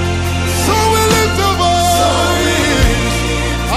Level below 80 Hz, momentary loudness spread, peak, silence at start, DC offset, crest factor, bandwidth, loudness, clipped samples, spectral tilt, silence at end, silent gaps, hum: -22 dBFS; 5 LU; -2 dBFS; 0 s; under 0.1%; 12 dB; 16 kHz; -13 LUFS; under 0.1%; -4 dB/octave; 0 s; none; none